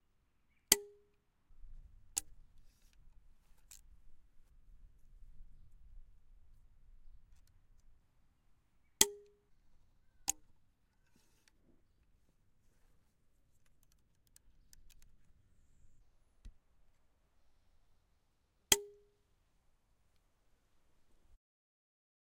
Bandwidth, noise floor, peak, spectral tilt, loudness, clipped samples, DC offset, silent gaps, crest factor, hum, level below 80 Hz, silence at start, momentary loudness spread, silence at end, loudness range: 16 kHz; -76 dBFS; -4 dBFS; 0 dB/octave; -34 LUFS; under 0.1%; under 0.1%; none; 42 dB; none; -64 dBFS; 0.7 s; 23 LU; 3.45 s; 11 LU